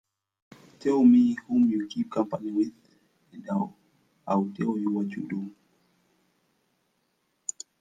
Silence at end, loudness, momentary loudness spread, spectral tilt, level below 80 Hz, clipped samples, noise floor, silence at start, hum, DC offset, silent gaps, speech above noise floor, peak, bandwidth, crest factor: 0.3 s; -26 LUFS; 17 LU; -6.5 dB/octave; -72 dBFS; under 0.1%; -74 dBFS; 0.8 s; none; under 0.1%; none; 49 dB; -10 dBFS; 9.6 kHz; 18 dB